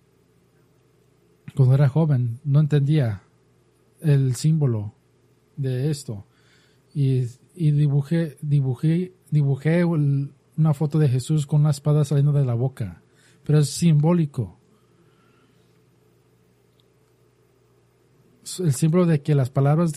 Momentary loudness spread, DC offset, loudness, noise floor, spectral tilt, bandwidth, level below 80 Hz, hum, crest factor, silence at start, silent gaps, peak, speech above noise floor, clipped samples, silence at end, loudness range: 13 LU; under 0.1%; -21 LUFS; -60 dBFS; -7.5 dB/octave; 12.5 kHz; -60 dBFS; none; 16 dB; 1.55 s; none; -6 dBFS; 40 dB; under 0.1%; 0 s; 5 LU